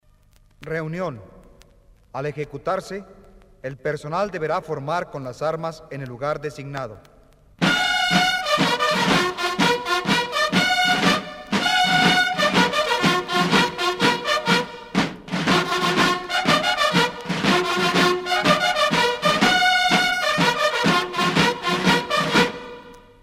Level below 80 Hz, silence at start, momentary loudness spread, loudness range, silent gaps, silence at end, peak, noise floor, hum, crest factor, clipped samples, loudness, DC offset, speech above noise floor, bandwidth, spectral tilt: -52 dBFS; 0.6 s; 12 LU; 10 LU; none; 0.25 s; -2 dBFS; -55 dBFS; none; 18 dB; under 0.1%; -20 LUFS; under 0.1%; 28 dB; 16 kHz; -3.5 dB/octave